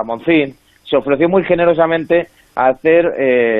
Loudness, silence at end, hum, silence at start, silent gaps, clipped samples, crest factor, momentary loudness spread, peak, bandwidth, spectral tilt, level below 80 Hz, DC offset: -14 LUFS; 0 s; none; 0 s; none; under 0.1%; 12 dB; 6 LU; -2 dBFS; 4.1 kHz; -8.5 dB/octave; -48 dBFS; under 0.1%